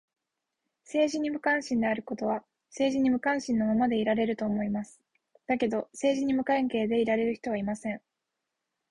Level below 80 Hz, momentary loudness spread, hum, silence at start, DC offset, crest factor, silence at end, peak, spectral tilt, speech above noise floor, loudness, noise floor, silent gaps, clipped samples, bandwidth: -64 dBFS; 9 LU; none; 0.9 s; under 0.1%; 16 dB; 0.9 s; -14 dBFS; -5.5 dB/octave; 58 dB; -29 LUFS; -85 dBFS; none; under 0.1%; 11 kHz